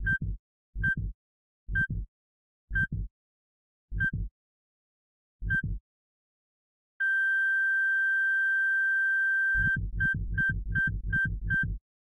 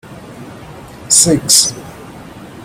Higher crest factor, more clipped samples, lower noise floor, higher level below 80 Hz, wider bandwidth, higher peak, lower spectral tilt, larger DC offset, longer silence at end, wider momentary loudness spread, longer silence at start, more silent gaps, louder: about the same, 12 dB vs 16 dB; second, under 0.1% vs 0.1%; first, under -90 dBFS vs -33 dBFS; about the same, -40 dBFS vs -44 dBFS; second, 11 kHz vs over 20 kHz; second, -18 dBFS vs 0 dBFS; first, -6.5 dB/octave vs -2 dB/octave; neither; first, 0.3 s vs 0 s; second, 15 LU vs 25 LU; about the same, 0 s vs 0.05 s; first, 0.39-0.73 s, 1.14-1.67 s, 2.08-2.68 s, 3.11-3.88 s, 4.31-5.39 s, 5.80-7.00 s vs none; second, -27 LUFS vs -9 LUFS